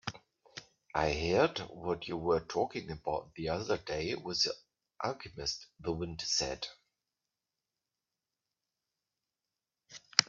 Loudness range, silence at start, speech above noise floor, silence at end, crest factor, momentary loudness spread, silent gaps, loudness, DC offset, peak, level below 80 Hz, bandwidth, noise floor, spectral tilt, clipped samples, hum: 6 LU; 0.05 s; over 55 dB; 0.05 s; 36 dB; 15 LU; none; -35 LUFS; under 0.1%; -2 dBFS; -58 dBFS; 7.8 kHz; under -90 dBFS; -3.5 dB/octave; under 0.1%; none